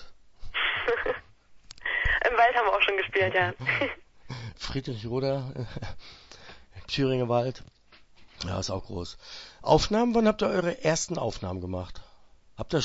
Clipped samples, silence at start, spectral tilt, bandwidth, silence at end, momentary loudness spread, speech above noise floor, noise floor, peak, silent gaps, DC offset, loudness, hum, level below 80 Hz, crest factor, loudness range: under 0.1%; 0 s; -4.5 dB/octave; 8 kHz; 0 s; 20 LU; 26 dB; -54 dBFS; -8 dBFS; none; under 0.1%; -27 LUFS; none; -46 dBFS; 22 dB; 7 LU